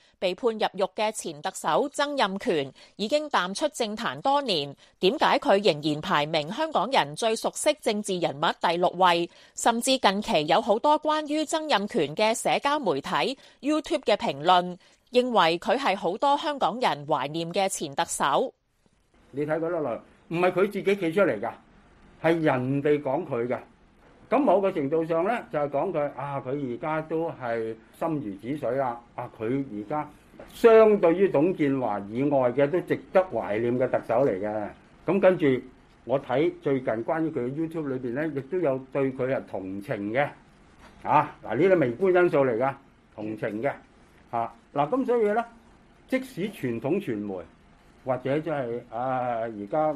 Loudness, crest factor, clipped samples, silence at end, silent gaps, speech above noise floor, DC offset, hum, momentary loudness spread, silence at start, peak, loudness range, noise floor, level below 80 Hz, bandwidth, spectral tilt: -26 LUFS; 20 dB; under 0.1%; 0 s; none; 41 dB; under 0.1%; none; 10 LU; 0.2 s; -6 dBFS; 6 LU; -66 dBFS; -62 dBFS; 14 kHz; -5 dB/octave